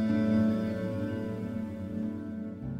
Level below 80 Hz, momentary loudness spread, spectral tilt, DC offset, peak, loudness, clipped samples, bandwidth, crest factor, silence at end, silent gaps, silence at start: -56 dBFS; 11 LU; -9 dB/octave; under 0.1%; -18 dBFS; -32 LUFS; under 0.1%; 6.8 kHz; 14 dB; 0 s; none; 0 s